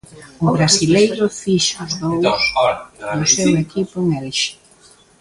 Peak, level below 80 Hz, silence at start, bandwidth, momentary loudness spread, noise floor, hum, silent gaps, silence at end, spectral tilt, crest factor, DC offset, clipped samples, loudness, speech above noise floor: 0 dBFS; -48 dBFS; 0.1 s; 11.5 kHz; 9 LU; -49 dBFS; none; none; 0.65 s; -4 dB/octave; 16 dB; under 0.1%; under 0.1%; -17 LUFS; 32 dB